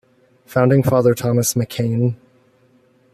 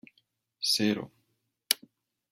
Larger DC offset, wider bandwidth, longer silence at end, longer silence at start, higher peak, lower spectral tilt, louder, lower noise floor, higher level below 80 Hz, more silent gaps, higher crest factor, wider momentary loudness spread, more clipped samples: neither; second, 14.5 kHz vs 16.5 kHz; first, 1 s vs 0.55 s; about the same, 0.5 s vs 0.6 s; about the same, -2 dBFS vs -4 dBFS; first, -6 dB/octave vs -2.5 dB/octave; first, -17 LUFS vs -29 LUFS; second, -55 dBFS vs -78 dBFS; first, -54 dBFS vs -78 dBFS; neither; second, 16 dB vs 30 dB; about the same, 8 LU vs 9 LU; neither